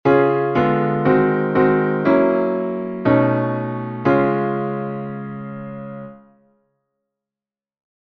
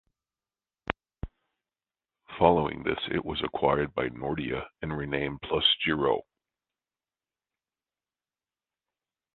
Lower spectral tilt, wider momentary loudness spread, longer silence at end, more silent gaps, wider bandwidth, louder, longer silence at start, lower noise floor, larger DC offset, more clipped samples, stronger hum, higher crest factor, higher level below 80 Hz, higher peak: first, -10 dB/octave vs -8.5 dB/octave; about the same, 15 LU vs 14 LU; second, 1.85 s vs 3.15 s; neither; first, 5.8 kHz vs 4.4 kHz; first, -18 LUFS vs -28 LUFS; second, 0.05 s vs 0.9 s; about the same, under -90 dBFS vs under -90 dBFS; neither; neither; neither; second, 18 dB vs 28 dB; about the same, -54 dBFS vs -52 dBFS; about the same, -2 dBFS vs -4 dBFS